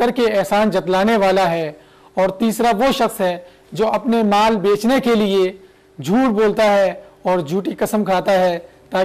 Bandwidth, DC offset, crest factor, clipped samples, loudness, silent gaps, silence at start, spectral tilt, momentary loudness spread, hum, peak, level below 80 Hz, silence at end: 15 kHz; under 0.1%; 8 dB; under 0.1%; -17 LUFS; none; 0 s; -5.5 dB/octave; 8 LU; none; -10 dBFS; -48 dBFS; 0 s